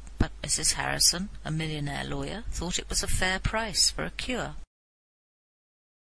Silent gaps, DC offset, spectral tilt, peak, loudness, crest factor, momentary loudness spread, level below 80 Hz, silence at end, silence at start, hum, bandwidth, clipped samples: none; 0.5%; -2 dB/octave; -8 dBFS; -27 LUFS; 22 dB; 12 LU; -38 dBFS; 1.5 s; 0 s; none; 11 kHz; under 0.1%